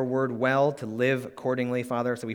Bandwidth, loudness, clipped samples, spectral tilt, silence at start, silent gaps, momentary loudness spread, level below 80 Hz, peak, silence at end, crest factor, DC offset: 18.5 kHz; -27 LUFS; under 0.1%; -7 dB/octave; 0 s; none; 5 LU; -72 dBFS; -10 dBFS; 0 s; 16 dB; under 0.1%